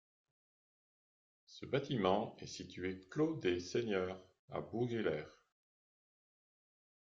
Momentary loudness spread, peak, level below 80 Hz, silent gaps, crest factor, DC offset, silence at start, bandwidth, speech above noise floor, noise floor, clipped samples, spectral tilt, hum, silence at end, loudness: 13 LU; -18 dBFS; -76 dBFS; 4.39-4.48 s; 22 dB; under 0.1%; 1.5 s; 7.6 kHz; over 51 dB; under -90 dBFS; under 0.1%; -5 dB/octave; none; 1.9 s; -39 LUFS